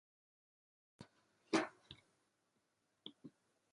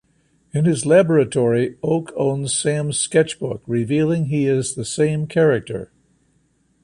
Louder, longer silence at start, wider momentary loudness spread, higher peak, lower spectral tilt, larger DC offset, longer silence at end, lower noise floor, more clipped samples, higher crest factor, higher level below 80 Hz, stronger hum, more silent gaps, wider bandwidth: second, -41 LUFS vs -19 LUFS; first, 1 s vs 0.55 s; first, 24 LU vs 8 LU; second, -22 dBFS vs -2 dBFS; second, -4 dB/octave vs -5.5 dB/octave; neither; second, 0.45 s vs 1 s; first, -84 dBFS vs -62 dBFS; neither; first, 28 dB vs 16 dB; second, -84 dBFS vs -54 dBFS; neither; neither; about the same, 11 kHz vs 11.5 kHz